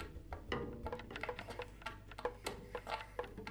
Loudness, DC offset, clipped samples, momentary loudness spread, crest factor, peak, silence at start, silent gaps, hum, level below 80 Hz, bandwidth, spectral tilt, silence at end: -46 LUFS; under 0.1%; under 0.1%; 5 LU; 22 dB; -24 dBFS; 0 s; none; none; -56 dBFS; over 20 kHz; -5 dB/octave; 0 s